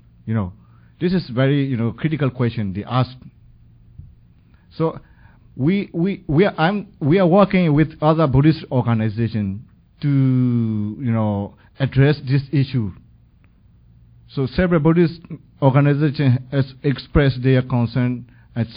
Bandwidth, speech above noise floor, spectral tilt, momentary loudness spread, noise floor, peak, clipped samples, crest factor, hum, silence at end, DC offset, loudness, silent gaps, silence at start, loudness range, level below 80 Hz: 5.2 kHz; 34 dB; -13 dB/octave; 11 LU; -52 dBFS; 0 dBFS; under 0.1%; 20 dB; none; 0 s; under 0.1%; -19 LUFS; none; 0.25 s; 8 LU; -40 dBFS